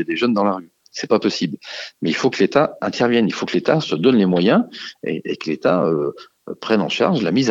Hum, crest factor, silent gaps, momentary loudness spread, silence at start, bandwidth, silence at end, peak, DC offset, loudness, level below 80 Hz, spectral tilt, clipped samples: none; 16 dB; none; 13 LU; 0 s; 7.8 kHz; 0 s; -2 dBFS; under 0.1%; -19 LUFS; -62 dBFS; -6 dB/octave; under 0.1%